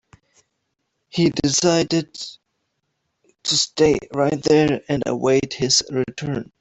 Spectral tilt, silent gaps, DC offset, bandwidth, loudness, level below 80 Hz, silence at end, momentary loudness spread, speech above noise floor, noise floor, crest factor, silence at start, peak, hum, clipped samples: -4 dB/octave; none; under 0.1%; 8.4 kHz; -19 LUFS; -52 dBFS; 0.15 s; 11 LU; 55 dB; -74 dBFS; 18 dB; 1.15 s; -2 dBFS; none; under 0.1%